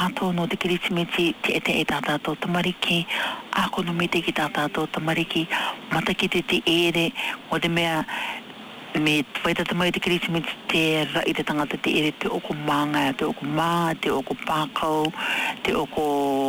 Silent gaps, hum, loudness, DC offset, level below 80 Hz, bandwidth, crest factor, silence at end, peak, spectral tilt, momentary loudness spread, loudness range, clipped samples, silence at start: none; none; -24 LUFS; under 0.1%; -54 dBFS; 19.5 kHz; 12 dB; 0 s; -12 dBFS; -4.5 dB/octave; 5 LU; 1 LU; under 0.1%; 0 s